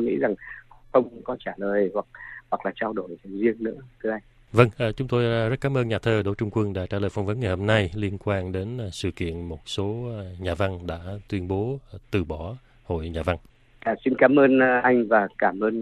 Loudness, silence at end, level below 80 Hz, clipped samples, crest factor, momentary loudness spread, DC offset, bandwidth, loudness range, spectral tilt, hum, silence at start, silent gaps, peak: -25 LUFS; 0 s; -50 dBFS; under 0.1%; 22 dB; 14 LU; under 0.1%; 12 kHz; 8 LU; -7 dB/octave; none; 0 s; none; -2 dBFS